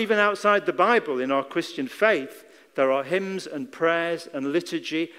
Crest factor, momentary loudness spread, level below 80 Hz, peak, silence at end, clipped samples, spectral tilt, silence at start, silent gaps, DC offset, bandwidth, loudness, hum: 20 dB; 11 LU; -74 dBFS; -6 dBFS; 0 s; under 0.1%; -4.5 dB/octave; 0 s; none; under 0.1%; 16 kHz; -24 LUFS; none